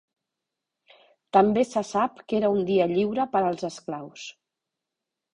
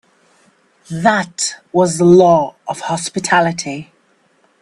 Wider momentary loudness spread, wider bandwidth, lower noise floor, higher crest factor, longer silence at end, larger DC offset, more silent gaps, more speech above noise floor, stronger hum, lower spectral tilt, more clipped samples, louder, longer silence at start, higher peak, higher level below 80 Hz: about the same, 15 LU vs 15 LU; second, 10.5 kHz vs 12 kHz; first, -86 dBFS vs -57 dBFS; first, 22 dB vs 16 dB; first, 1.05 s vs 0.8 s; neither; neither; first, 62 dB vs 43 dB; neither; first, -6 dB/octave vs -4.5 dB/octave; neither; second, -24 LUFS vs -14 LUFS; first, 1.35 s vs 0.9 s; second, -6 dBFS vs 0 dBFS; second, -64 dBFS vs -56 dBFS